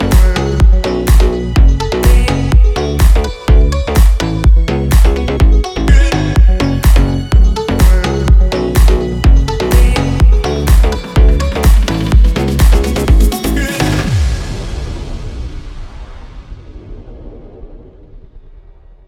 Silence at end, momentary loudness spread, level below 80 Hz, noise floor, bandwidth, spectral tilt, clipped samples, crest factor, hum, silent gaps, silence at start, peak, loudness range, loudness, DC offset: 0.6 s; 11 LU; -10 dBFS; -37 dBFS; 15.5 kHz; -6 dB/octave; under 0.1%; 10 dB; none; none; 0 s; 0 dBFS; 9 LU; -12 LUFS; under 0.1%